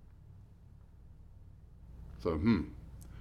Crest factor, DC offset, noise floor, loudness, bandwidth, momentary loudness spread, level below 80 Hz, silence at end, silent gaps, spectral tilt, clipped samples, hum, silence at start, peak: 22 dB; under 0.1%; -56 dBFS; -34 LUFS; 12 kHz; 27 LU; -52 dBFS; 0 s; none; -8.5 dB/octave; under 0.1%; none; 0 s; -18 dBFS